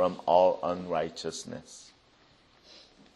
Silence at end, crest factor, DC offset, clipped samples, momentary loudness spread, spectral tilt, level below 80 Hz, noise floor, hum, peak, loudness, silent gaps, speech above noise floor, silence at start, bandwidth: 1.35 s; 22 dB; under 0.1%; under 0.1%; 22 LU; -4.5 dB/octave; -68 dBFS; -62 dBFS; none; -10 dBFS; -28 LUFS; none; 33 dB; 0 s; 11.5 kHz